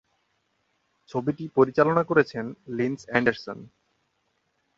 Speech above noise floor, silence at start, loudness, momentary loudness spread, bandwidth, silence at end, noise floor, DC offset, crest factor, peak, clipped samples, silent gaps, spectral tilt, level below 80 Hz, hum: 49 dB; 1.15 s; -25 LUFS; 15 LU; 7.6 kHz; 1.15 s; -73 dBFS; under 0.1%; 24 dB; -4 dBFS; under 0.1%; none; -7.5 dB/octave; -64 dBFS; none